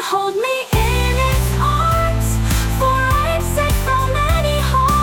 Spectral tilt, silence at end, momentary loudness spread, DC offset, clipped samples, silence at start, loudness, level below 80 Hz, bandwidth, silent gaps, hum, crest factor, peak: -5 dB/octave; 0 s; 3 LU; under 0.1%; under 0.1%; 0 s; -17 LUFS; -20 dBFS; 17.5 kHz; none; none; 10 dB; -4 dBFS